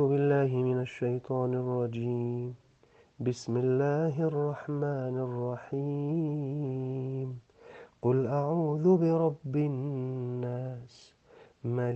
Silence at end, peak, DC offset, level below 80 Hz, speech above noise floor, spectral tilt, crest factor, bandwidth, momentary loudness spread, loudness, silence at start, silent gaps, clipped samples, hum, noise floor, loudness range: 0 s; -14 dBFS; under 0.1%; -72 dBFS; 32 dB; -9 dB/octave; 18 dB; 8 kHz; 10 LU; -31 LUFS; 0 s; none; under 0.1%; none; -62 dBFS; 4 LU